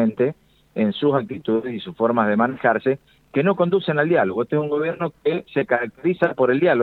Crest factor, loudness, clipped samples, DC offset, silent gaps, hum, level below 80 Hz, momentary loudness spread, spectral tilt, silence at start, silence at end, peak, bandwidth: 18 dB; -21 LUFS; under 0.1%; under 0.1%; none; none; -62 dBFS; 6 LU; -9 dB/octave; 0 s; 0 s; -4 dBFS; 4.5 kHz